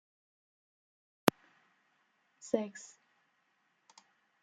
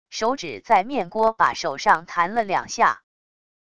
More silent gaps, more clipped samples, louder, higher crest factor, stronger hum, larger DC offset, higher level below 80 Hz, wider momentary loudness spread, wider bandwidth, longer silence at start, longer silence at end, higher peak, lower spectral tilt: neither; neither; second, -35 LUFS vs -21 LUFS; first, 38 dB vs 20 dB; neither; second, under 0.1% vs 0.5%; second, -80 dBFS vs -60 dBFS; first, 21 LU vs 6 LU; about the same, 10.5 kHz vs 11 kHz; first, 1.25 s vs 0.1 s; first, 1.55 s vs 0.75 s; about the same, -2 dBFS vs -2 dBFS; first, -4.5 dB/octave vs -3 dB/octave